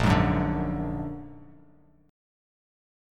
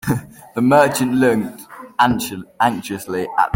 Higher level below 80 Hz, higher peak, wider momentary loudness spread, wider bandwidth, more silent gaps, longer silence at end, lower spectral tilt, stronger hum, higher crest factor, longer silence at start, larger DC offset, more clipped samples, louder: first, -40 dBFS vs -50 dBFS; second, -8 dBFS vs -2 dBFS; first, 18 LU vs 15 LU; second, 14 kHz vs 17 kHz; neither; first, 1.65 s vs 0 s; first, -7.5 dB/octave vs -5.5 dB/octave; neither; about the same, 20 dB vs 16 dB; about the same, 0 s vs 0.05 s; neither; neither; second, -27 LUFS vs -18 LUFS